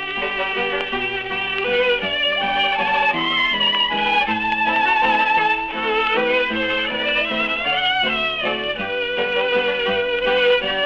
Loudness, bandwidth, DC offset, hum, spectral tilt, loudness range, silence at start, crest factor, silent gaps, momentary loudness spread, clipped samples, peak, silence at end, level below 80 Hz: -18 LUFS; 7.6 kHz; under 0.1%; none; -4 dB/octave; 2 LU; 0 s; 14 dB; none; 5 LU; under 0.1%; -6 dBFS; 0 s; -48 dBFS